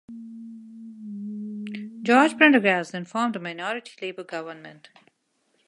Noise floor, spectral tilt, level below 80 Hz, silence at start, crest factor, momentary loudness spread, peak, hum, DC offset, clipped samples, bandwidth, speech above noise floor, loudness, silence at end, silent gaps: -71 dBFS; -5 dB/octave; -80 dBFS; 0.1 s; 22 dB; 25 LU; -2 dBFS; none; under 0.1%; under 0.1%; 11.5 kHz; 48 dB; -23 LUFS; 0.95 s; none